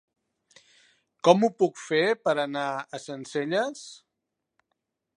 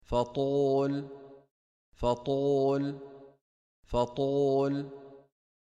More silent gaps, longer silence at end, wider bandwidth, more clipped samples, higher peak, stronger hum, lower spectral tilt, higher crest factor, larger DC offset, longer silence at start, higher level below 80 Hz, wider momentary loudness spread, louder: second, none vs 1.51-1.92 s, 3.41-3.83 s; first, 1.25 s vs 0.55 s; about the same, 10.5 kHz vs 9.6 kHz; neither; first, -4 dBFS vs -16 dBFS; neither; second, -5 dB/octave vs -7.5 dB/octave; first, 24 dB vs 16 dB; neither; first, 1.25 s vs 0.1 s; second, -82 dBFS vs -52 dBFS; about the same, 16 LU vs 18 LU; first, -25 LUFS vs -30 LUFS